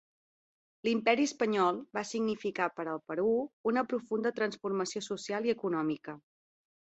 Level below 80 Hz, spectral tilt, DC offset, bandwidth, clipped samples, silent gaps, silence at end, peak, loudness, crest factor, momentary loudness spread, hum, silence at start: -76 dBFS; -4.5 dB/octave; under 0.1%; 8.2 kHz; under 0.1%; 3.53-3.64 s; 0.65 s; -12 dBFS; -32 LUFS; 20 dB; 8 LU; none; 0.85 s